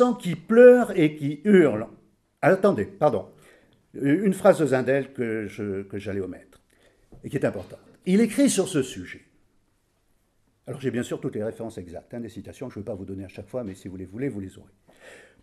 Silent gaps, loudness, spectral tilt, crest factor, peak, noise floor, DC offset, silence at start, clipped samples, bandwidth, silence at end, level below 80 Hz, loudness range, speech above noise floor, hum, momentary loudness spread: none; -23 LUFS; -6 dB/octave; 22 dB; -2 dBFS; -67 dBFS; under 0.1%; 0 s; under 0.1%; 14 kHz; 0.3 s; -62 dBFS; 14 LU; 45 dB; none; 20 LU